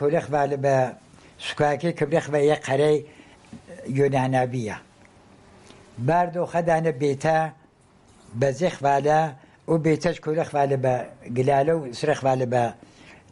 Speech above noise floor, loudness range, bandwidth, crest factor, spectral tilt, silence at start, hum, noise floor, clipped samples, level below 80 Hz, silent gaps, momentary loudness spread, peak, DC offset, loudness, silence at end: 33 dB; 3 LU; 11.5 kHz; 16 dB; -6.5 dB/octave; 0 s; none; -56 dBFS; under 0.1%; -58 dBFS; none; 9 LU; -8 dBFS; under 0.1%; -23 LUFS; 0.2 s